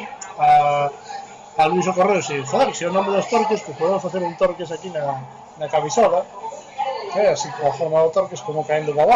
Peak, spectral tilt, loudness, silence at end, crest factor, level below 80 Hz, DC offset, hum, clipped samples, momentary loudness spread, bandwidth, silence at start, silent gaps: -6 dBFS; -4.5 dB/octave; -20 LUFS; 0 s; 14 dB; -58 dBFS; under 0.1%; none; under 0.1%; 14 LU; 8.8 kHz; 0 s; none